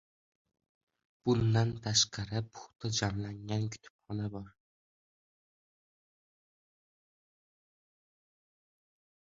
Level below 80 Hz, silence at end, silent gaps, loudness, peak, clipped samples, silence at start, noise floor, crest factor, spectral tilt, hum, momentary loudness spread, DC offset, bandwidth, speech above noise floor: -60 dBFS; 4.8 s; 3.90-3.99 s; -33 LUFS; -14 dBFS; under 0.1%; 1.25 s; under -90 dBFS; 24 dB; -4 dB/octave; none; 14 LU; under 0.1%; 8 kHz; over 57 dB